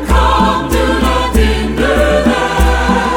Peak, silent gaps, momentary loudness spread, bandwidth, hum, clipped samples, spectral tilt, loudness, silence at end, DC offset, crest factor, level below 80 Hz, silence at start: 0 dBFS; none; 3 LU; 19 kHz; none; under 0.1%; -5.5 dB/octave; -12 LUFS; 0 s; under 0.1%; 12 dB; -16 dBFS; 0 s